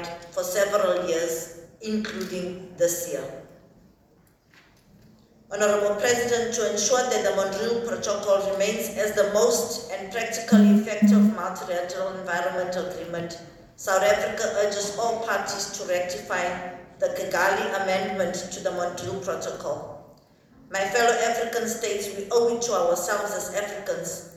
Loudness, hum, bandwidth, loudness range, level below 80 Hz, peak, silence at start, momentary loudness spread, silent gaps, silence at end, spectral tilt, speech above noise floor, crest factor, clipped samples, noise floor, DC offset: -25 LUFS; none; 17.5 kHz; 8 LU; -60 dBFS; -6 dBFS; 0 s; 11 LU; none; 0 s; -4 dB/octave; 35 dB; 18 dB; under 0.1%; -59 dBFS; under 0.1%